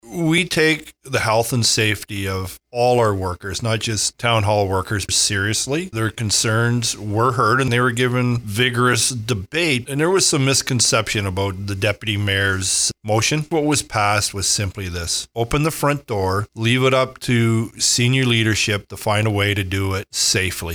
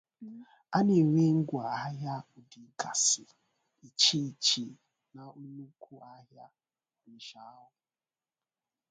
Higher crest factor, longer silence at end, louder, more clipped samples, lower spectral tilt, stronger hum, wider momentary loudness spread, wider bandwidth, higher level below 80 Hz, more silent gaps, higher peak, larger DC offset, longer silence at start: second, 16 dB vs 22 dB; second, 0 s vs 1.4 s; first, -18 LUFS vs -28 LUFS; neither; about the same, -3.5 dB/octave vs -3.5 dB/octave; neither; second, 7 LU vs 24 LU; first, over 20 kHz vs 9.6 kHz; first, -46 dBFS vs -76 dBFS; neither; first, -2 dBFS vs -10 dBFS; neither; second, 0.05 s vs 0.2 s